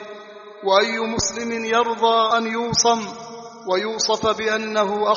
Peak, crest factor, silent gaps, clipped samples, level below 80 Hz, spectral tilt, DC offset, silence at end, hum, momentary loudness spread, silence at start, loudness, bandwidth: -4 dBFS; 18 dB; none; under 0.1%; -52 dBFS; -1.5 dB/octave; under 0.1%; 0 s; none; 17 LU; 0 s; -20 LUFS; 7.4 kHz